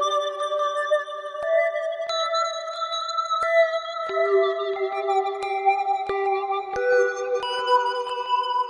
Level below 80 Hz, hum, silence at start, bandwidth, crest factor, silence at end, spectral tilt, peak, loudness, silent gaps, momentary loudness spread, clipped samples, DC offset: -66 dBFS; none; 0 s; 11 kHz; 16 dB; 0 s; -1.5 dB/octave; -8 dBFS; -24 LUFS; none; 6 LU; under 0.1%; under 0.1%